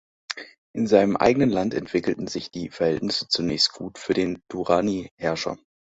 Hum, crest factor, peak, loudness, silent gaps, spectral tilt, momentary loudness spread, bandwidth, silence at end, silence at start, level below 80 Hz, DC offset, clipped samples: none; 22 dB; -4 dBFS; -23 LUFS; 0.58-0.74 s, 5.11-5.18 s; -5 dB/octave; 15 LU; 8 kHz; 0.4 s; 0.3 s; -54 dBFS; under 0.1%; under 0.1%